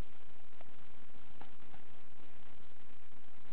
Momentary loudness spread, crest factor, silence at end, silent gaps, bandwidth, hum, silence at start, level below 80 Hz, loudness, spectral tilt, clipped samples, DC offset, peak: 4 LU; 24 dB; 0 s; none; 4 kHz; none; 0 s; -72 dBFS; -61 LUFS; -7.5 dB/octave; under 0.1%; 4%; -26 dBFS